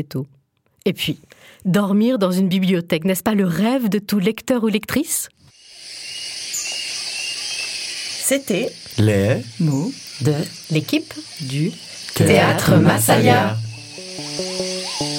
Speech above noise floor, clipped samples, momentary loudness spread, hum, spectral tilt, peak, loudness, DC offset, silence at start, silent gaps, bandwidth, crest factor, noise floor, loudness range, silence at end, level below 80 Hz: 25 dB; under 0.1%; 15 LU; none; -5 dB/octave; 0 dBFS; -19 LUFS; under 0.1%; 0 s; none; 17 kHz; 18 dB; -43 dBFS; 6 LU; 0 s; -54 dBFS